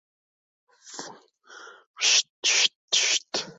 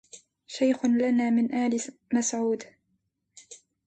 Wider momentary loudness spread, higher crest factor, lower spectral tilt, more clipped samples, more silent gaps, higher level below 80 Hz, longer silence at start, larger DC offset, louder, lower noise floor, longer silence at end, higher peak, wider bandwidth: first, 20 LU vs 14 LU; first, 22 dB vs 14 dB; second, 2.5 dB/octave vs -4 dB/octave; neither; first, 1.86-1.94 s, 2.30-2.43 s, 2.76-2.88 s vs none; second, -84 dBFS vs -72 dBFS; first, 0.85 s vs 0.15 s; neither; first, -21 LUFS vs -26 LUFS; second, -49 dBFS vs -76 dBFS; second, 0.05 s vs 0.3 s; first, -6 dBFS vs -12 dBFS; about the same, 8.4 kHz vs 9 kHz